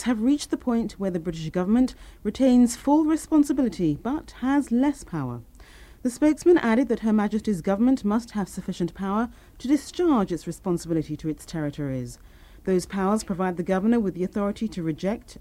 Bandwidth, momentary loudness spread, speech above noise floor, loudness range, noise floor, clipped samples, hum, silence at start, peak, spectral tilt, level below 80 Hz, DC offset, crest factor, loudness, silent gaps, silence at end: 15 kHz; 11 LU; 24 dB; 5 LU; -47 dBFS; under 0.1%; none; 0 s; -8 dBFS; -6.5 dB/octave; -48 dBFS; under 0.1%; 16 dB; -25 LUFS; none; 0.05 s